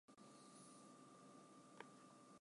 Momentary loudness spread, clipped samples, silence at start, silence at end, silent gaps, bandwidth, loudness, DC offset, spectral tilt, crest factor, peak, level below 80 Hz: 3 LU; under 0.1%; 0.1 s; 0 s; none; 11.5 kHz; -64 LUFS; under 0.1%; -4 dB/octave; 28 dB; -38 dBFS; under -90 dBFS